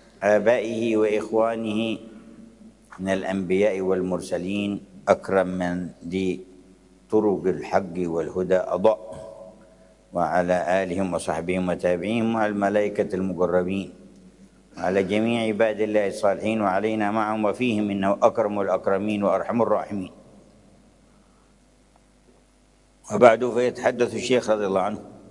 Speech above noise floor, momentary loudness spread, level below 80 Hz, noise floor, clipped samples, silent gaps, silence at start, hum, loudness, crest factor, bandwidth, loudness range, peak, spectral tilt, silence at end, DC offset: 35 dB; 9 LU; -60 dBFS; -58 dBFS; under 0.1%; none; 0.2 s; none; -23 LUFS; 24 dB; 11.5 kHz; 4 LU; 0 dBFS; -6 dB/octave; 0.1 s; under 0.1%